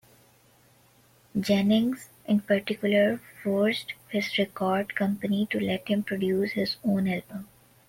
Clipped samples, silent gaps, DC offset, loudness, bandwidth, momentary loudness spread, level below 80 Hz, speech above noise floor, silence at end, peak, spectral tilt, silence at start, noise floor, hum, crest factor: under 0.1%; none; under 0.1%; -27 LUFS; 16.5 kHz; 9 LU; -64 dBFS; 34 dB; 0.45 s; -12 dBFS; -6 dB/octave; 1.35 s; -60 dBFS; none; 16 dB